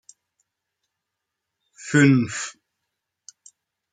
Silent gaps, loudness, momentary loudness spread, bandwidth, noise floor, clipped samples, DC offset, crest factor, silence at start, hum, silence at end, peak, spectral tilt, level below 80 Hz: none; -20 LUFS; 18 LU; 9.4 kHz; -83 dBFS; under 0.1%; under 0.1%; 22 dB; 1.8 s; none; 1.4 s; -4 dBFS; -5.5 dB/octave; -68 dBFS